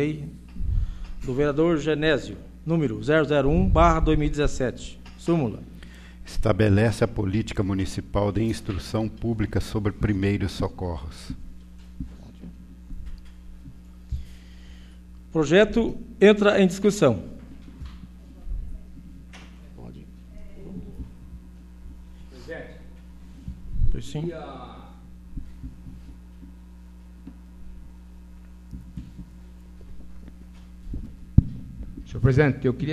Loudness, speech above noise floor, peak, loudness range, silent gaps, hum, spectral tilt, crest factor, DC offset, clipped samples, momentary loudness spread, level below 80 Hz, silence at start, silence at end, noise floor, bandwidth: -24 LUFS; 22 dB; 0 dBFS; 23 LU; none; none; -7 dB/octave; 24 dB; under 0.1%; under 0.1%; 26 LU; -34 dBFS; 0 s; 0 s; -44 dBFS; 13.5 kHz